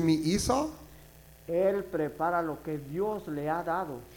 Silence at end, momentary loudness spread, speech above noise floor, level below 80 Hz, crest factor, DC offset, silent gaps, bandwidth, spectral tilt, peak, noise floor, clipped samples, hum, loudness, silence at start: 0 s; 9 LU; 23 dB; -52 dBFS; 18 dB; under 0.1%; none; 18 kHz; -5.5 dB/octave; -12 dBFS; -53 dBFS; under 0.1%; none; -31 LUFS; 0 s